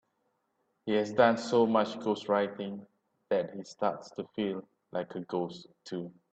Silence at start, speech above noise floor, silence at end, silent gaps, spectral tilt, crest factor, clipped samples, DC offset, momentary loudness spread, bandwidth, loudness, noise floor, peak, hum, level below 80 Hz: 0.85 s; 47 dB; 0.25 s; none; -6 dB/octave; 22 dB; under 0.1%; under 0.1%; 15 LU; 8.6 kHz; -31 LUFS; -78 dBFS; -10 dBFS; none; -76 dBFS